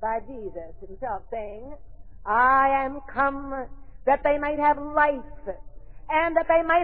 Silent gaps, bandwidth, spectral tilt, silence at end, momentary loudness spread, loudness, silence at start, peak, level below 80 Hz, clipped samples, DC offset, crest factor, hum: none; 4.7 kHz; -9 dB/octave; 0 s; 19 LU; -24 LUFS; 0 s; -8 dBFS; -44 dBFS; under 0.1%; 0.8%; 18 dB; none